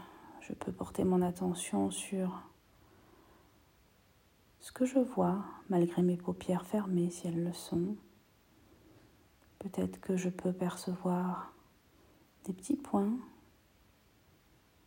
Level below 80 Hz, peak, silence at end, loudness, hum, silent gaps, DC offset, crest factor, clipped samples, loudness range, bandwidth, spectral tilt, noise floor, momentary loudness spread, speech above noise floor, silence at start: -68 dBFS; -18 dBFS; 1.55 s; -35 LUFS; none; none; under 0.1%; 20 dB; under 0.1%; 6 LU; 16 kHz; -6.5 dB/octave; -67 dBFS; 16 LU; 33 dB; 0 s